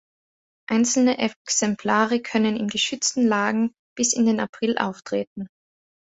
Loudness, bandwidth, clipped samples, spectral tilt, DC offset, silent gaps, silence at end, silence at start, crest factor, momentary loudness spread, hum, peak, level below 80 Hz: -22 LUFS; 8.2 kHz; under 0.1%; -3 dB/octave; under 0.1%; 1.36-1.45 s, 3.79-3.96 s, 4.49-4.53 s, 5.27-5.36 s; 0.55 s; 0.7 s; 20 dB; 9 LU; none; -4 dBFS; -66 dBFS